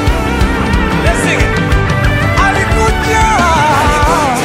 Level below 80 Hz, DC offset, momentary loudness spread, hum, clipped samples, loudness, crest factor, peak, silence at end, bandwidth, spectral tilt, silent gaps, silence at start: -18 dBFS; under 0.1%; 4 LU; none; under 0.1%; -11 LUFS; 10 dB; 0 dBFS; 0 s; 16 kHz; -5 dB/octave; none; 0 s